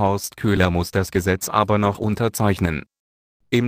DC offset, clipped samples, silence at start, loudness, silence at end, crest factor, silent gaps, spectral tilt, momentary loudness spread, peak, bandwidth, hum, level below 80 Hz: under 0.1%; under 0.1%; 0 s; -21 LUFS; 0 s; 18 dB; 2.99-3.40 s; -5.5 dB/octave; 5 LU; -2 dBFS; 15.5 kHz; none; -40 dBFS